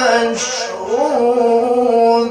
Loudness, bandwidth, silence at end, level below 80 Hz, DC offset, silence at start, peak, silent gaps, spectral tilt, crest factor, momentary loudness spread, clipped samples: -15 LUFS; 10.5 kHz; 0 s; -58 dBFS; under 0.1%; 0 s; -2 dBFS; none; -2.5 dB/octave; 12 dB; 7 LU; under 0.1%